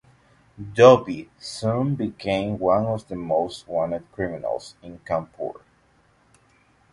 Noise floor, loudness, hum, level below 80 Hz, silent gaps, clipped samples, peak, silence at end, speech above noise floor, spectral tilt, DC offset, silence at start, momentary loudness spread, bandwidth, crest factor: -60 dBFS; -23 LUFS; none; -54 dBFS; none; under 0.1%; 0 dBFS; 1.4 s; 38 dB; -6.5 dB/octave; under 0.1%; 0.6 s; 19 LU; 11.5 kHz; 22 dB